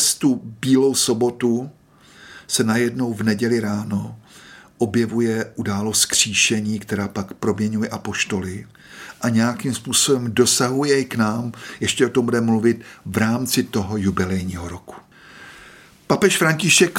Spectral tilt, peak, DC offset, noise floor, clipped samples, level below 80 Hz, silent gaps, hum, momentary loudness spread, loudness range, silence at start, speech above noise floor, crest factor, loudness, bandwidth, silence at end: -3.5 dB/octave; -2 dBFS; under 0.1%; -48 dBFS; under 0.1%; -54 dBFS; none; none; 12 LU; 4 LU; 0 s; 28 dB; 18 dB; -19 LUFS; 16.5 kHz; 0 s